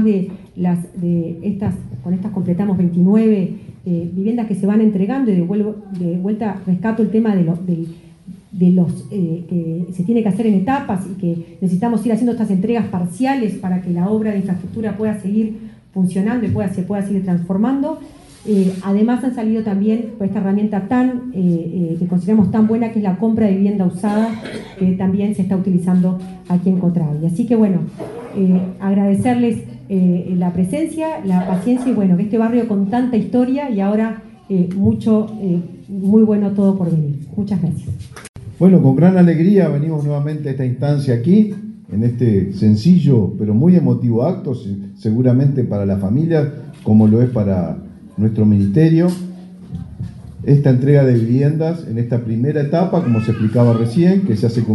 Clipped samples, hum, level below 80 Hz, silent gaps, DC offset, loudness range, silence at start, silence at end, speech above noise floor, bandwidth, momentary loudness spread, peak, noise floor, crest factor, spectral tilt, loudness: under 0.1%; none; -50 dBFS; 38.29-38.34 s; under 0.1%; 4 LU; 0 s; 0 s; 23 dB; 11.5 kHz; 11 LU; 0 dBFS; -38 dBFS; 16 dB; -9.5 dB/octave; -16 LUFS